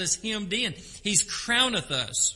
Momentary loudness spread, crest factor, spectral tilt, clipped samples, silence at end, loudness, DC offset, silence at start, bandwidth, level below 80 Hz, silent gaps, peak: 6 LU; 20 dB; -1 dB/octave; under 0.1%; 0 s; -25 LUFS; under 0.1%; 0 s; 11.5 kHz; -54 dBFS; none; -8 dBFS